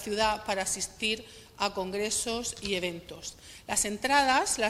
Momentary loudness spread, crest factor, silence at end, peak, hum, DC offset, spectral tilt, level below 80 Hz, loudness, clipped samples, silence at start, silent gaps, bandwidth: 16 LU; 22 dB; 0 s; -8 dBFS; none; under 0.1%; -1.5 dB/octave; -54 dBFS; -29 LUFS; under 0.1%; 0 s; none; 16 kHz